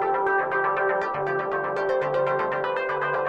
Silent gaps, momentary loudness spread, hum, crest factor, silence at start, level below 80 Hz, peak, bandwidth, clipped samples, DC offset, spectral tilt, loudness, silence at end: none; 3 LU; none; 12 dB; 0 s; -62 dBFS; -12 dBFS; 7.4 kHz; under 0.1%; under 0.1%; -6.5 dB/octave; -25 LUFS; 0 s